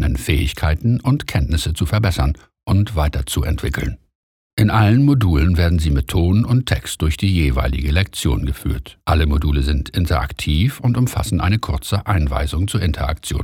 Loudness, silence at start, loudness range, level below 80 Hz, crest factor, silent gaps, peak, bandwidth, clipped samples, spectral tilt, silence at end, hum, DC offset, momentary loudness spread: -18 LUFS; 0 s; 3 LU; -24 dBFS; 16 dB; 4.15-4.57 s; -2 dBFS; 17 kHz; under 0.1%; -6 dB/octave; 0 s; none; under 0.1%; 6 LU